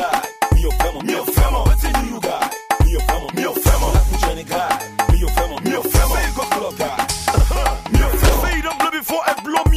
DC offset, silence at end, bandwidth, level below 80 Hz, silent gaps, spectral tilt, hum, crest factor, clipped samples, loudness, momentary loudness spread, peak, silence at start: under 0.1%; 0 s; 15.5 kHz; -20 dBFS; none; -4.5 dB/octave; none; 12 dB; under 0.1%; -18 LUFS; 5 LU; -4 dBFS; 0 s